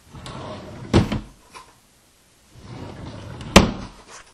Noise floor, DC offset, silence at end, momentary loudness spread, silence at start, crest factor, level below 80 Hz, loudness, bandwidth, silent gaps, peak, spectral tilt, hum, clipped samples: -56 dBFS; under 0.1%; 0.1 s; 24 LU; 0.15 s; 24 dB; -34 dBFS; -19 LUFS; 16 kHz; none; 0 dBFS; -5 dB/octave; none; under 0.1%